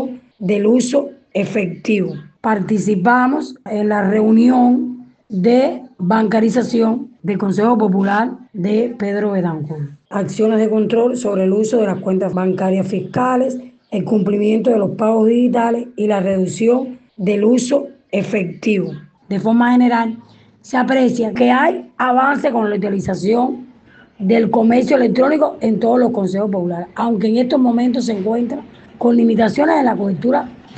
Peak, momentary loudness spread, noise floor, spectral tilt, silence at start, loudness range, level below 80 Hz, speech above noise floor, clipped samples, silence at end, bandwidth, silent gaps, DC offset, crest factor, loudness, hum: -2 dBFS; 10 LU; -46 dBFS; -7 dB/octave; 0 s; 3 LU; -60 dBFS; 31 dB; under 0.1%; 0 s; 8.8 kHz; none; under 0.1%; 14 dB; -16 LUFS; none